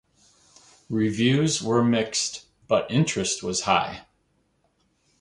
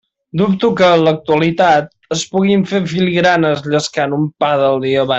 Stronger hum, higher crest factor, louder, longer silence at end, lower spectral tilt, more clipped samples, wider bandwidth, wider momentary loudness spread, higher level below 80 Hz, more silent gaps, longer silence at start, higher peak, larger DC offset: neither; first, 20 dB vs 12 dB; second, -24 LUFS vs -14 LUFS; first, 1.2 s vs 0 s; about the same, -4.5 dB/octave vs -5.5 dB/octave; neither; first, 11.5 kHz vs 8.2 kHz; first, 9 LU vs 6 LU; second, -58 dBFS vs -52 dBFS; neither; first, 0.9 s vs 0.35 s; second, -6 dBFS vs -2 dBFS; neither